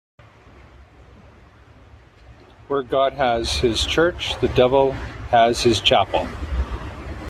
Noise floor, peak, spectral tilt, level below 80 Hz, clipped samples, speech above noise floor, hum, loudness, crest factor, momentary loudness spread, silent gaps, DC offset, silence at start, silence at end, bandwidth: -48 dBFS; -2 dBFS; -4.5 dB/octave; -36 dBFS; under 0.1%; 29 dB; none; -19 LUFS; 20 dB; 12 LU; none; under 0.1%; 0.8 s; 0 s; 14 kHz